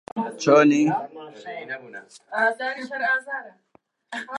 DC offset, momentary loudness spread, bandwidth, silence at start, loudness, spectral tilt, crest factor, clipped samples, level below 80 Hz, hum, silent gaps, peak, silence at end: under 0.1%; 21 LU; 11 kHz; 0.15 s; -22 LUFS; -5 dB/octave; 20 dB; under 0.1%; -76 dBFS; none; none; -4 dBFS; 0 s